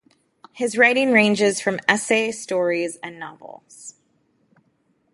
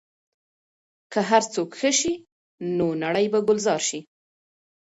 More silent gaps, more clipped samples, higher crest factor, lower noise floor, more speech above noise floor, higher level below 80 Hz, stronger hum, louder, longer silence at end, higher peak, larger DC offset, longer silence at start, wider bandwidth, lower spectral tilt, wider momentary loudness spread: second, none vs 2.32-2.58 s; neither; about the same, 22 dB vs 20 dB; second, -66 dBFS vs under -90 dBFS; second, 45 dB vs over 67 dB; second, -70 dBFS vs -64 dBFS; neither; first, -19 LUFS vs -23 LUFS; first, 1.25 s vs 0.85 s; first, 0 dBFS vs -6 dBFS; neither; second, 0.55 s vs 1.1 s; first, 11.5 kHz vs 8 kHz; about the same, -3.5 dB/octave vs -3.5 dB/octave; first, 22 LU vs 9 LU